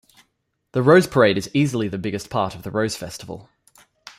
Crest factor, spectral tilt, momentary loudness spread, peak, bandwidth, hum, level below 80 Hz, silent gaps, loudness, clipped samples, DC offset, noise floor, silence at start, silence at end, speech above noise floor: 20 dB; -6 dB/octave; 18 LU; -2 dBFS; 15.5 kHz; none; -56 dBFS; none; -20 LUFS; under 0.1%; under 0.1%; -72 dBFS; 0.75 s; 0.75 s; 52 dB